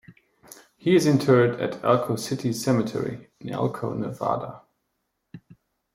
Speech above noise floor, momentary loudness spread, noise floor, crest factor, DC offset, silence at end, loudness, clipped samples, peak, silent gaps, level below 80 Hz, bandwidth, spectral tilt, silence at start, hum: 54 dB; 12 LU; -77 dBFS; 20 dB; under 0.1%; 0.55 s; -24 LUFS; under 0.1%; -6 dBFS; none; -62 dBFS; 16.5 kHz; -6.5 dB/octave; 0.1 s; none